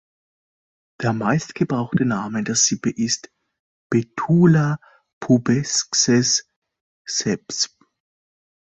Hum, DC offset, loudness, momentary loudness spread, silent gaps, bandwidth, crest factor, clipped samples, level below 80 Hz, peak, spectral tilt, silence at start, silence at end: none; under 0.1%; -20 LUFS; 9 LU; 3.60-3.90 s, 5.13-5.21 s, 6.56-6.62 s, 6.81-7.05 s; 8.4 kHz; 18 dB; under 0.1%; -58 dBFS; -4 dBFS; -4 dB/octave; 1 s; 1 s